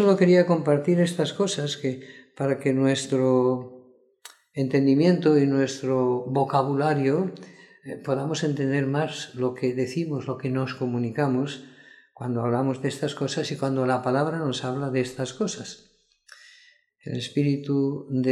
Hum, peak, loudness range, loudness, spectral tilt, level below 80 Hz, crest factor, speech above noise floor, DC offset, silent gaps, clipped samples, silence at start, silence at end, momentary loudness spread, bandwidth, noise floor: none; -6 dBFS; 6 LU; -24 LUFS; -6.5 dB/octave; -70 dBFS; 18 dB; 34 dB; under 0.1%; none; under 0.1%; 0 s; 0 s; 12 LU; 12 kHz; -57 dBFS